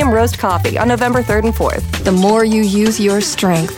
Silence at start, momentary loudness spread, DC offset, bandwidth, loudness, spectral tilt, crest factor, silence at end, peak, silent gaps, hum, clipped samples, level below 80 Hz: 0 s; 4 LU; under 0.1%; 19.5 kHz; -14 LUFS; -5 dB/octave; 12 dB; 0 s; -2 dBFS; none; none; under 0.1%; -28 dBFS